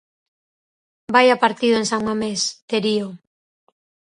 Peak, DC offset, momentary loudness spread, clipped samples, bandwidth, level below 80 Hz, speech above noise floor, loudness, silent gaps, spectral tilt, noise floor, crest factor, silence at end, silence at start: 0 dBFS; under 0.1%; 8 LU; under 0.1%; 11 kHz; -62 dBFS; over 71 dB; -19 LUFS; 2.62-2.68 s; -3.5 dB/octave; under -90 dBFS; 20 dB; 1 s; 1.1 s